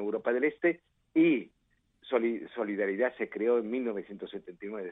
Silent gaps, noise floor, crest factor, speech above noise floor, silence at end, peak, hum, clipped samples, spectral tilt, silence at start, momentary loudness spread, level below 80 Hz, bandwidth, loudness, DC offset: none; -63 dBFS; 16 dB; 33 dB; 0 s; -14 dBFS; none; under 0.1%; -9 dB/octave; 0 s; 15 LU; -76 dBFS; 3.9 kHz; -30 LUFS; under 0.1%